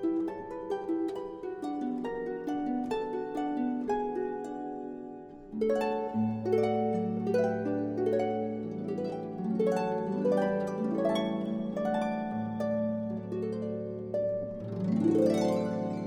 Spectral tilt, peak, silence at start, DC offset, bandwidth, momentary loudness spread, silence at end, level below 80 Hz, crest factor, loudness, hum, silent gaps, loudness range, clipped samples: -7.5 dB/octave; -12 dBFS; 0 s; under 0.1%; 12 kHz; 9 LU; 0 s; -62 dBFS; 18 dB; -32 LUFS; none; none; 3 LU; under 0.1%